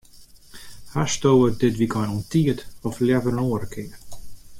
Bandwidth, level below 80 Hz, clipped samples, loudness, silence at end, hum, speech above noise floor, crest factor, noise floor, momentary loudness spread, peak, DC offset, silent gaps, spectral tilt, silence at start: 16.5 kHz; -46 dBFS; under 0.1%; -22 LUFS; 0 s; none; 26 dB; 16 dB; -47 dBFS; 18 LU; -6 dBFS; under 0.1%; none; -6 dB/octave; 0.15 s